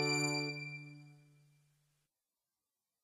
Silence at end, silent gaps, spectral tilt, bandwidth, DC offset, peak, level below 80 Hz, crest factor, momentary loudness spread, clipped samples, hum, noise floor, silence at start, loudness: 1.85 s; none; -3.5 dB/octave; 14.5 kHz; under 0.1%; -20 dBFS; -90 dBFS; 22 dB; 22 LU; under 0.1%; none; under -90 dBFS; 0 s; -37 LUFS